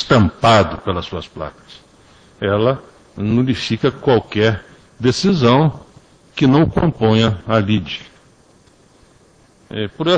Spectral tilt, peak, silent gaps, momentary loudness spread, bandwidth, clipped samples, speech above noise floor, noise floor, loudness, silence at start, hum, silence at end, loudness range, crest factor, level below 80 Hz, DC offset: -6.5 dB/octave; 0 dBFS; none; 15 LU; 9.8 kHz; under 0.1%; 35 dB; -51 dBFS; -16 LUFS; 0 s; none; 0 s; 5 LU; 18 dB; -42 dBFS; under 0.1%